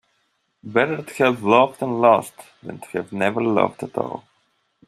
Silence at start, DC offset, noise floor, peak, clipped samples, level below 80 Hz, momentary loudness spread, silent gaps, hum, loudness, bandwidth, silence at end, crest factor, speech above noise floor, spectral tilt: 0.65 s; under 0.1%; -69 dBFS; -2 dBFS; under 0.1%; -66 dBFS; 20 LU; none; none; -20 LUFS; 14.5 kHz; 0.7 s; 20 dB; 49 dB; -6 dB/octave